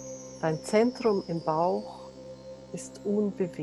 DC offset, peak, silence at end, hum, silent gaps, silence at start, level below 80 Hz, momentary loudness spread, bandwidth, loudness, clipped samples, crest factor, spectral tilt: under 0.1%; -12 dBFS; 0 s; none; none; 0 s; -64 dBFS; 19 LU; 12 kHz; -28 LUFS; under 0.1%; 18 dB; -6 dB/octave